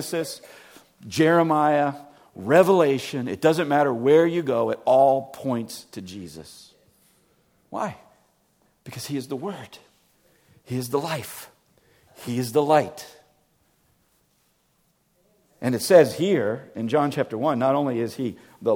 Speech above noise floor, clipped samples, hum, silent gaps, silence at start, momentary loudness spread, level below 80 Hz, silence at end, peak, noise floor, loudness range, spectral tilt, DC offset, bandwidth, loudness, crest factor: 45 dB; under 0.1%; none; none; 0 s; 20 LU; -68 dBFS; 0 s; -2 dBFS; -67 dBFS; 15 LU; -5.5 dB/octave; under 0.1%; 18.5 kHz; -22 LUFS; 22 dB